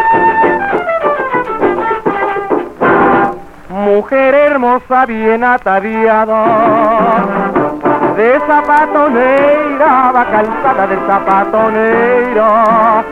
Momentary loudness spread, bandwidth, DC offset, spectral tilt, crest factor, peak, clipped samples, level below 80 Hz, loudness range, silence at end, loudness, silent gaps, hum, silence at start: 5 LU; 10.5 kHz; under 0.1%; -7.5 dB/octave; 10 dB; 0 dBFS; under 0.1%; -42 dBFS; 2 LU; 0 s; -10 LUFS; none; none; 0 s